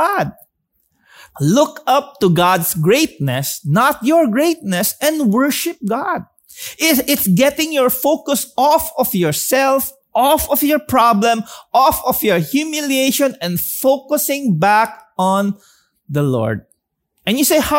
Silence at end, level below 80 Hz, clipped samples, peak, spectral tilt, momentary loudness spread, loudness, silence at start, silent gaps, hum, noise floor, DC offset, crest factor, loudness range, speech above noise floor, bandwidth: 0 s; -48 dBFS; under 0.1%; -2 dBFS; -4.5 dB/octave; 7 LU; -15 LUFS; 0 s; none; none; -68 dBFS; under 0.1%; 14 dB; 2 LU; 53 dB; 16.5 kHz